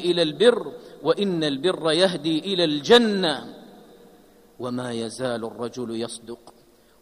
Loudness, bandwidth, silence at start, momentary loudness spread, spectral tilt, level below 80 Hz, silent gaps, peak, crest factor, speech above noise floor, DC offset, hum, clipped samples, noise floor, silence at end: -22 LUFS; 14 kHz; 0 s; 17 LU; -4.5 dB/octave; -66 dBFS; none; -4 dBFS; 20 dB; 30 dB; under 0.1%; none; under 0.1%; -53 dBFS; 0.5 s